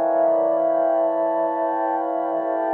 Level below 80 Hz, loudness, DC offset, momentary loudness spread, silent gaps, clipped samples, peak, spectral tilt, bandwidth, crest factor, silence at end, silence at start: -78 dBFS; -21 LUFS; under 0.1%; 4 LU; none; under 0.1%; -10 dBFS; -8.5 dB/octave; 3.1 kHz; 12 dB; 0 s; 0 s